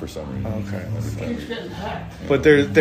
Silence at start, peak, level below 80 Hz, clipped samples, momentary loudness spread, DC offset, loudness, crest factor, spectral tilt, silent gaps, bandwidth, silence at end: 0 s; -2 dBFS; -40 dBFS; under 0.1%; 15 LU; under 0.1%; -22 LUFS; 20 dB; -6.5 dB/octave; none; 15.5 kHz; 0 s